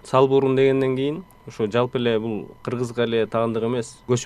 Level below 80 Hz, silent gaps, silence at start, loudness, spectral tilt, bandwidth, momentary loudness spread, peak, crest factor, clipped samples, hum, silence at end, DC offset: -56 dBFS; none; 0.05 s; -22 LUFS; -6 dB/octave; 11 kHz; 12 LU; -2 dBFS; 18 dB; under 0.1%; none; 0 s; under 0.1%